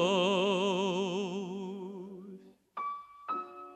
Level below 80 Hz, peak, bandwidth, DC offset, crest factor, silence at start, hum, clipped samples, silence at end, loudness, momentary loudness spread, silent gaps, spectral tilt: -84 dBFS; -16 dBFS; 10.5 kHz; under 0.1%; 18 dB; 0 s; none; under 0.1%; 0 s; -33 LUFS; 19 LU; none; -5 dB/octave